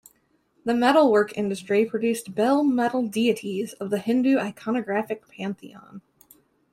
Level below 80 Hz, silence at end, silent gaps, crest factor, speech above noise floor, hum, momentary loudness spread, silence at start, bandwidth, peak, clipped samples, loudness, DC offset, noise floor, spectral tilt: -70 dBFS; 0.75 s; none; 18 dB; 43 dB; none; 14 LU; 0.65 s; 15.5 kHz; -6 dBFS; under 0.1%; -24 LUFS; under 0.1%; -66 dBFS; -5.5 dB/octave